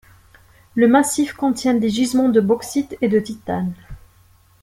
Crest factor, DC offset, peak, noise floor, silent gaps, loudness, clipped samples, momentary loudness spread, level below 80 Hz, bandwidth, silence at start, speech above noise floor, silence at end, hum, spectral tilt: 18 dB; under 0.1%; -2 dBFS; -53 dBFS; none; -18 LUFS; under 0.1%; 11 LU; -50 dBFS; 15.5 kHz; 0.75 s; 35 dB; 0.65 s; none; -5 dB/octave